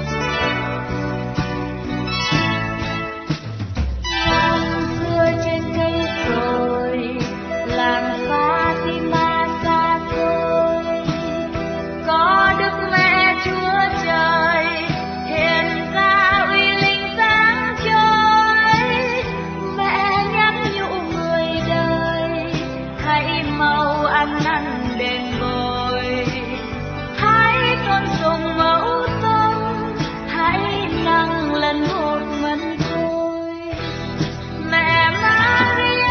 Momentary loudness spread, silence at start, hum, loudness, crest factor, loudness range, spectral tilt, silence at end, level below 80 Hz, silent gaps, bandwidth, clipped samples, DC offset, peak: 11 LU; 0 s; none; -18 LUFS; 16 dB; 5 LU; -5.5 dB/octave; 0 s; -36 dBFS; none; 6.6 kHz; under 0.1%; under 0.1%; -2 dBFS